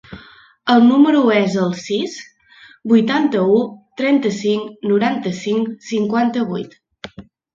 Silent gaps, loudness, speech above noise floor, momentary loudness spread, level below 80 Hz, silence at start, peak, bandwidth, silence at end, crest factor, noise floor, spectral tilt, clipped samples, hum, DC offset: none; -17 LUFS; 31 dB; 18 LU; -60 dBFS; 0.1 s; 0 dBFS; 7.6 kHz; 0.35 s; 16 dB; -47 dBFS; -6 dB/octave; under 0.1%; none; under 0.1%